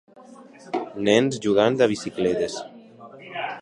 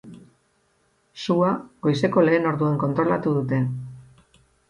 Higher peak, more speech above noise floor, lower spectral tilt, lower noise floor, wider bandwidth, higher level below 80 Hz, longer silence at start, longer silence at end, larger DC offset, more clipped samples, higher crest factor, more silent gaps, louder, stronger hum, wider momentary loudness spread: about the same, -4 dBFS vs -6 dBFS; second, 25 dB vs 44 dB; second, -5 dB/octave vs -8 dB/octave; second, -46 dBFS vs -66 dBFS; about the same, 11 kHz vs 11 kHz; about the same, -60 dBFS vs -60 dBFS; first, 0.3 s vs 0.05 s; second, 0 s vs 0.7 s; neither; neither; about the same, 20 dB vs 18 dB; neither; about the same, -23 LUFS vs -22 LUFS; neither; first, 16 LU vs 10 LU